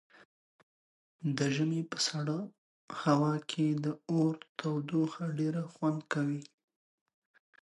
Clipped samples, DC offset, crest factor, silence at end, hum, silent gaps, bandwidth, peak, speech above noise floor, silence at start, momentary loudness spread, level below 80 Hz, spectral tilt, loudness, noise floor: under 0.1%; under 0.1%; 20 dB; 1.2 s; none; 2.58-2.88 s, 4.49-4.55 s; 11.5 kHz; -14 dBFS; over 58 dB; 1.2 s; 8 LU; -80 dBFS; -5.5 dB/octave; -33 LUFS; under -90 dBFS